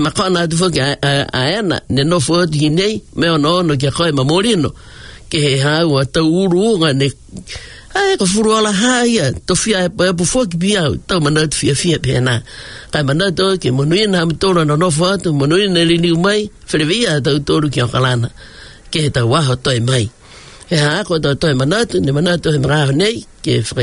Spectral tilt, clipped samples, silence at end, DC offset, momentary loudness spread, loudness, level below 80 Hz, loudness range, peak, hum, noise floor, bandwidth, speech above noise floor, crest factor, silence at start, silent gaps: -5 dB/octave; under 0.1%; 0 s; under 0.1%; 5 LU; -14 LUFS; -40 dBFS; 2 LU; -2 dBFS; none; -38 dBFS; 11 kHz; 24 dB; 12 dB; 0 s; none